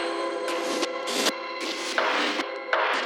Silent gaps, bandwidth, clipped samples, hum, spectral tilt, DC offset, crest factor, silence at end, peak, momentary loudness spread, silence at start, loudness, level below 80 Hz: none; 19 kHz; under 0.1%; none; -0.5 dB/octave; under 0.1%; 22 dB; 0 s; -6 dBFS; 6 LU; 0 s; -26 LUFS; under -90 dBFS